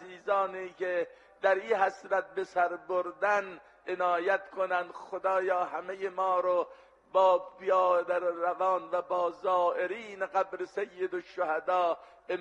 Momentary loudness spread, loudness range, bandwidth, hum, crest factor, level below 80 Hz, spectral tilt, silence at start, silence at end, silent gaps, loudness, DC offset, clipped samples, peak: 9 LU; 3 LU; 8.4 kHz; none; 18 dB; -78 dBFS; -4.5 dB/octave; 0 s; 0 s; none; -30 LUFS; under 0.1%; under 0.1%; -12 dBFS